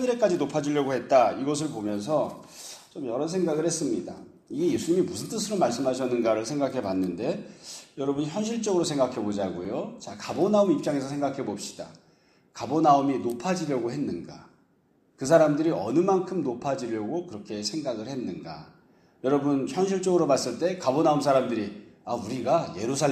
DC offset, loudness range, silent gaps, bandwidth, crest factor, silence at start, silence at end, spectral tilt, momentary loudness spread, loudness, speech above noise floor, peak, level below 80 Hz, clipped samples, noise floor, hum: under 0.1%; 4 LU; none; 14.5 kHz; 20 dB; 0 s; 0 s; -5.5 dB/octave; 15 LU; -26 LUFS; 39 dB; -6 dBFS; -66 dBFS; under 0.1%; -65 dBFS; none